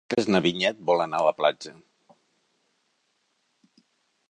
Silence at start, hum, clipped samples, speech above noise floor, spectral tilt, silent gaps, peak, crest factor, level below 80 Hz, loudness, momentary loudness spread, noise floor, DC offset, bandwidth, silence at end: 0.1 s; none; under 0.1%; 48 dB; -5 dB/octave; none; -6 dBFS; 22 dB; -66 dBFS; -24 LUFS; 9 LU; -72 dBFS; under 0.1%; 10.5 kHz; 2.6 s